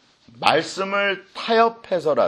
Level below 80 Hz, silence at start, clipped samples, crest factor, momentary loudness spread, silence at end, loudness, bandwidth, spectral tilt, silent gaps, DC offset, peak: -68 dBFS; 0.4 s; under 0.1%; 22 dB; 6 LU; 0 s; -21 LUFS; 12 kHz; -4 dB/octave; none; under 0.1%; 0 dBFS